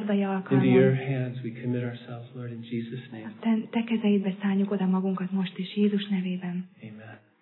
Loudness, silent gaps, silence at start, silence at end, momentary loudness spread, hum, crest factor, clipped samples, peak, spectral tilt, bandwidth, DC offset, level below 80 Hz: -27 LUFS; none; 0 s; 0.25 s; 17 LU; none; 18 dB; under 0.1%; -10 dBFS; -11.5 dB/octave; 4.2 kHz; under 0.1%; -78 dBFS